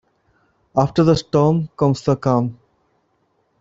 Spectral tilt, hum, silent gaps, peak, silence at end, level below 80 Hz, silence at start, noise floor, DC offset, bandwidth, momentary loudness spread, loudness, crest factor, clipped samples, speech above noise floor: -8 dB/octave; none; none; -2 dBFS; 1.05 s; -48 dBFS; 0.75 s; -65 dBFS; under 0.1%; 7.8 kHz; 5 LU; -18 LUFS; 18 dB; under 0.1%; 48 dB